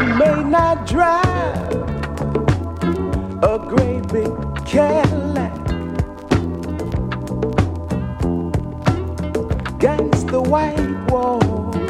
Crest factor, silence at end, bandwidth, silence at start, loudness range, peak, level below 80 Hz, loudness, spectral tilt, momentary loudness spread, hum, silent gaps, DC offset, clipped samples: 18 dB; 0 s; 13.5 kHz; 0 s; 3 LU; 0 dBFS; -30 dBFS; -19 LUFS; -7.5 dB/octave; 8 LU; none; none; under 0.1%; under 0.1%